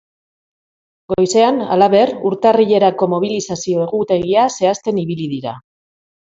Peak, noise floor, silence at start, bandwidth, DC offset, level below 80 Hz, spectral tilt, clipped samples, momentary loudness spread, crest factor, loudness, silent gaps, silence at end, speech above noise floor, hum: 0 dBFS; under -90 dBFS; 1.1 s; 8 kHz; under 0.1%; -54 dBFS; -5.5 dB/octave; under 0.1%; 10 LU; 16 dB; -15 LUFS; none; 0.6 s; over 75 dB; none